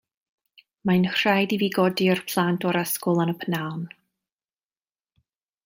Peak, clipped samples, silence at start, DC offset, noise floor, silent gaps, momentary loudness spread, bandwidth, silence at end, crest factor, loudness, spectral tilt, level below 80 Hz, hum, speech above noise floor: -6 dBFS; under 0.1%; 0.85 s; under 0.1%; under -90 dBFS; none; 10 LU; 16.5 kHz; 1.8 s; 20 dB; -23 LUFS; -5.5 dB/octave; -68 dBFS; none; over 67 dB